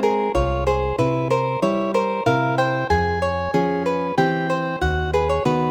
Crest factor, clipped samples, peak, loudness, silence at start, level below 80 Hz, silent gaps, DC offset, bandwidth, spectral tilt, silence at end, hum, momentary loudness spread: 16 dB; under 0.1%; -4 dBFS; -21 LUFS; 0 s; -34 dBFS; none; under 0.1%; 17.5 kHz; -7 dB/octave; 0 s; none; 2 LU